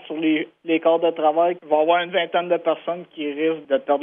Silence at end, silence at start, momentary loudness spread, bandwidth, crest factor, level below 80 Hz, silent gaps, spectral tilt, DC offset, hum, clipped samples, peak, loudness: 0 s; 0.05 s; 7 LU; 3.7 kHz; 16 dB; -80 dBFS; none; -8.5 dB/octave; under 0.1%; none; under 0.1%; -4 dBFS; -21 LUFS